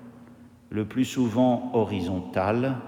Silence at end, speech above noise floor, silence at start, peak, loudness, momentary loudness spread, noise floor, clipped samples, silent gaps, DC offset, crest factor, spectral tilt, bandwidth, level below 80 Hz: 0 s; 25 dB; 0 s; -10 dBFS; -26 LUFS; 7 LU; -50 dBFS; under 0.1%; none; under 0.1%; 16 dB; -7 dB/octave; 15.5 kHz; -64 dBFS